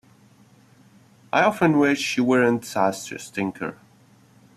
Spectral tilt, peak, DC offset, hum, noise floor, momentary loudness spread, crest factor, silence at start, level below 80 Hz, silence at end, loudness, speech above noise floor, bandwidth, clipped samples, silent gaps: -5 dB/octave; -4 dBFS; under 0.1%; none; -55 dBFS; 14 LU; 20 dB; 1.35 s; -64 dBFS; 0.8 s; -22 LUFS; 33 dB; 14 kHz; under 0.1%; none